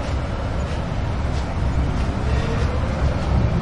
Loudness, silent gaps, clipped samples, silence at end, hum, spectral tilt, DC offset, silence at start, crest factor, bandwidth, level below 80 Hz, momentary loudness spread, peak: -23 LUFS; none; under 0.1%; 0 s; none; -7 dB/octave; under 0.1%; 0 s; 14 dB; 10.5 kHz; -24 dBFS; 4 LU; -8 dBFS